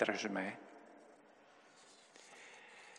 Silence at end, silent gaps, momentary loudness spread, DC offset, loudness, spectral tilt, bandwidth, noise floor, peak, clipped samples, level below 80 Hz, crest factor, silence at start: 0 s; none; 24 LU; under 0.1%; -43 LUFS; -4 dB/octave; 11.5 kHz; -65 dBFS; -18 dBFS; under 0.1%; under -90 dBFS; 28 dB; 0 s